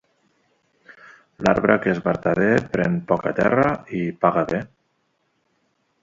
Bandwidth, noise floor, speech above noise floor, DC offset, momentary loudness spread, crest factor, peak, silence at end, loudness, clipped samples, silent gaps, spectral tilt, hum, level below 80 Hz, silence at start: 7.8 kHz; -69 dBFS; 49 dB; under 0.1%; 8 LU; 22 dB; 0 dBFS; 1.35 s; -21 LUFS; under 0.1%; none; -7.5 dB/octave; none; -52 dBFS; 1.4 s